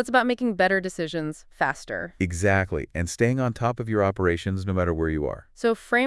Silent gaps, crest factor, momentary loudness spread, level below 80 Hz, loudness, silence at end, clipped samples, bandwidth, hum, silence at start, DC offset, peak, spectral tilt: none; 18 dB; 8 LU; -46 dBFS; -25 LUFS; 0 s; under 0.1%; 12 kHz; none; 0 s; under 0.1%; -6 dBFS; -6 dB/octave